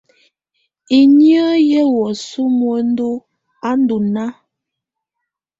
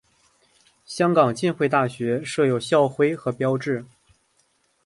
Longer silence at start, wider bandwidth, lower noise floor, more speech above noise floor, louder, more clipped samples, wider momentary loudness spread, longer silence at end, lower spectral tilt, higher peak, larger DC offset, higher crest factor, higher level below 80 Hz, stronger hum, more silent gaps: about the same, 0.9 s vs 0.9 s; second, 7.8 kHz vs 11.5 kHz; first, -80 dBFS vs -66 dBFS; first, 67 dB vs 45 dB; first, -14 LUFS vs -22 LUFS; neither; first, 13 LU vs 7 LU; first, 1.3 s vs 1 s; about the same, -6 dB/octave vs -6 dB/octave; about the same, -2 dBFS vs -4 dBFS; neither; about the same, 14 dB vs 18 dB; about the same, -62 dBFS vs -64 dBFS; neither; neither